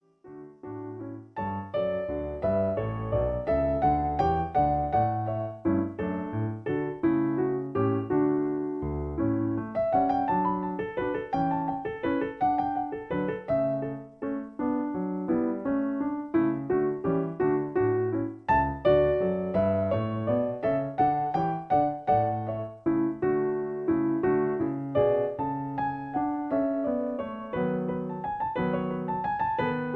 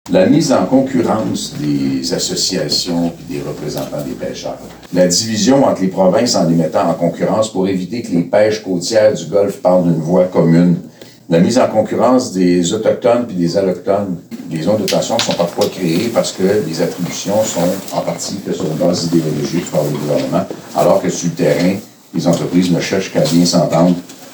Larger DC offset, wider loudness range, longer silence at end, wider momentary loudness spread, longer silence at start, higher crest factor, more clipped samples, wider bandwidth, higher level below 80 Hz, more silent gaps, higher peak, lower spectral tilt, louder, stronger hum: neither; about the same, 4 LU vs 4 LU; about the same, 0 s vs 0 s; about the same, 7 LU vs 9 LU; first, 0.25 s vs 0.05 s; about the same, 16 dB vs 14 dB; neither; second, 5.6 kHz vs over 20 kHz; about the same, -48 dBFS vs -50 dBFS; neither; second, -12 dBFS vs -2 dBFS; first, -10 dB/octave vs -5 dB/octave; second, -28 LUFS vs -15 LUFS; neither